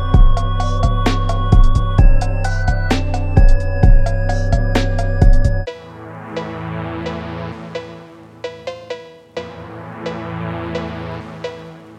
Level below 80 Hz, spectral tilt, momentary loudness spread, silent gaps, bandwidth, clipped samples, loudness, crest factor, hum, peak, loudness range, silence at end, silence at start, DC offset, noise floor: -16 dBFS; -7 dB/octave; 16 LU; none; 8.6 kHz; under 0.1%; -19 LUFS; 14 dB; none; 0 dBFS; 12 LU; 0.2 s; 0 s; under 0.1%; -38 dBFS